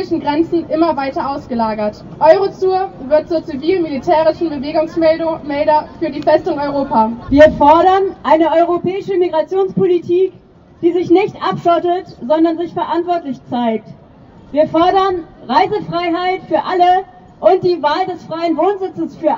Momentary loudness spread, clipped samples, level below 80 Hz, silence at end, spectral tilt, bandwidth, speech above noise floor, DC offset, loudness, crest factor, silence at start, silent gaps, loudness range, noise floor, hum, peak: 9 LU; under 0.1%; -44 dBFS; 0 s; -7 dB/octave; 7.2 kHz; 27 dB; under 0.1%; -15 LUFS; 14 dB; 0 s; none; 4 LU; -41 dBFS; none; 0 dBFS